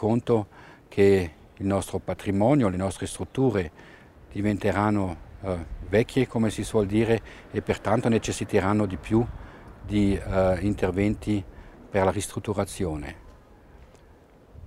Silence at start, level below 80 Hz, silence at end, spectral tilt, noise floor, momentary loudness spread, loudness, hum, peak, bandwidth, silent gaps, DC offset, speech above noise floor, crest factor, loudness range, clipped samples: 0 s; -44 dBFS; 0 s; -6.5 dB/octave; -53 dBFS; 11 LU; -26 LUFS; none; -8 dBFS; 15 kHz; none; under 0.1%; 28 dB; 18 dB; 3 LU; under 0.1%